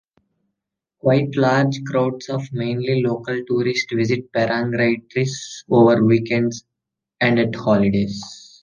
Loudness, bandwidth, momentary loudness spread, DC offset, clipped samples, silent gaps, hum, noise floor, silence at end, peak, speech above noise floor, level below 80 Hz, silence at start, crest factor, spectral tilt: -19 LUFS; 9.6 kHz; 9 LU; under 0.1%; under 0.1%; none; none; -82 dBFS; 0.2 s; -2 dBFS; 64 dB; -54 dBFS; 1.05 s; 18 dB; -6.5 dB/octave